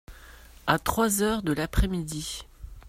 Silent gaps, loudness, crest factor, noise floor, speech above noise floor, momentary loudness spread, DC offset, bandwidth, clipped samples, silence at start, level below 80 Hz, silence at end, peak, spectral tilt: none; -27 LUFS; 24 dB; -49 dBFS; 23 dB; 12 LU; under 0.1%; 16 kHz; under 0.1%; 0.1 s; -36 dBFS; 0 s; -4 dBFS; -4.5 dB/octave